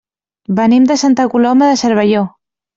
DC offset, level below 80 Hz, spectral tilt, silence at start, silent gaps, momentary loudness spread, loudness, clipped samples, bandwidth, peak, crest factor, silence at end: under 0.1%; -56 dBFS; -5 dB/octave; 0.5 s; none; 7 LU; -11 LUFS; under 0.1%; 7.8 kHz; -2 dBFS; 10 dB; 0.5 s